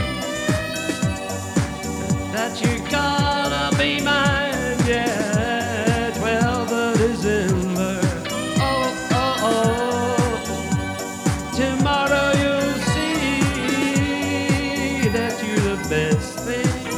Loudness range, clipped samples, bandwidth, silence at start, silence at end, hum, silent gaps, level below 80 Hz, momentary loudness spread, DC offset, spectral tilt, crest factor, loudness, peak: 2 LU; under 0.1%; 16.5 kHz; 0 s; 0 s; none; none; -36 dBFS; 6 LU; under 0.1%; -4.5 dB/octave; 16 dB; -21 LUFS; -6 dBFS